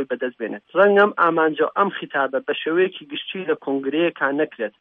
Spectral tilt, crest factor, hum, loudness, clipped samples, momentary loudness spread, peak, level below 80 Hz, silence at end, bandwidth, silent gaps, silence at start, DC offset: -8 dB/octave; 18 dB; none; -20 LUFS; under 0.1%; 11 LU; -4 dBFS; -78 dBFS; 0.1 s; 4.2 kHz; none; 0 s; under 0.1%